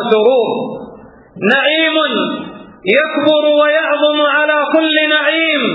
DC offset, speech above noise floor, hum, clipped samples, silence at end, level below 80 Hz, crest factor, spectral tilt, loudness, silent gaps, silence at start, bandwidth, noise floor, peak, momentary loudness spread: under 0.1%; 24 dB; none; under 0.1%; 0 s; -60 dBFS; 14 dB; -6.5 dB/octave; -12 LUFS; none; 0 s; 5 kHz; -37 dBFS; 0 dBFS; 10 LU